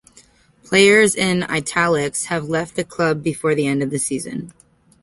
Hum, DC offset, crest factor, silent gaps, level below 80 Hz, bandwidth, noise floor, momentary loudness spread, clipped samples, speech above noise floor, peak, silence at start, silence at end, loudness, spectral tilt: none; under 0.1%; 18 dB; none; -54 dBFS; 12 kHz; -52 dBFS; 14 LU; under 0.1%; 33 dB; -2 dBFS; 0.7 s; 0.55 s; -18 LUFS; -4 dB/octave